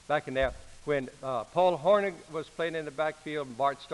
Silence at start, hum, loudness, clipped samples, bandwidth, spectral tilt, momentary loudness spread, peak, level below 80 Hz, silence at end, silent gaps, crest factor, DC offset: 0.1 s; none; -30 LUFS; under 0.1%; 11.5 kHz; -5.5 dB/octave; 11 LU; -12 dBFS; -54 dBFS; 0 s; none; 18 dB; under 0.1%